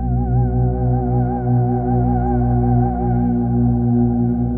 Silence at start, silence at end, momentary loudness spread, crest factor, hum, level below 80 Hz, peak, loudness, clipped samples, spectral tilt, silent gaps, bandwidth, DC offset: 0 s; 0 s; 2 LU; 10 dB; 60 Hz at -25 dBFS; -24 dBFS; -6 dBFS; -18 LUFS; under 0.1%; -15.5 dB/octave; none; 1.8 kHz; under 0.1%